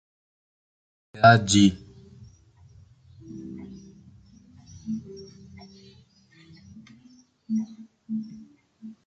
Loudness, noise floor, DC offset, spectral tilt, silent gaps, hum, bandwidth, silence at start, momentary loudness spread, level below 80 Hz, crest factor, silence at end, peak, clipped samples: -22 LUFS; -56 dBFS; under 0.1%; -5 dB/octave; none; none; 9.2 kHz; 1.15 s; 30 LU; -56 dBFS; 26 dB; 0.15 s; -2 dBFS; under 0.1%